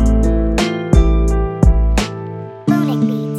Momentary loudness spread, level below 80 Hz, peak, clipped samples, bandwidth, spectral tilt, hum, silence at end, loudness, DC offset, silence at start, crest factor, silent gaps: 9 LU; -16 dBFS; 0 dBFS; under 0.1%; 11 kHz; -7 dB/octave; none; 0 s; -16 LUFS; under 0.1%; 0 s; 12 dB; none